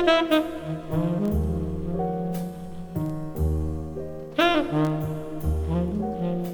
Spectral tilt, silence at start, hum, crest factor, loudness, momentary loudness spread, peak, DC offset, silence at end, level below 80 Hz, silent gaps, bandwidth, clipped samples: -7 dB/octave; 0 s; none; 20 dB; -26 LUFS; 11 LU; -6 dBFS; under 0.1%; 0 s; -36 dBFS; none; over 20 kHz; under 0.1%